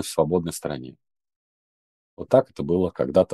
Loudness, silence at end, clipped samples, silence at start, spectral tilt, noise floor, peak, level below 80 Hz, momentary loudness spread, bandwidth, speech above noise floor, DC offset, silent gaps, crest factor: -23 LUFS; 0 s; under 0.1%; 0 s; -6.5 dB/octave; under -90 dBFS; -4 dBFS; -54 dBFS; 15 LU; 12.5 kHz; over 67 dB; under 0.1%; 1.36-2.17 s; 20 dB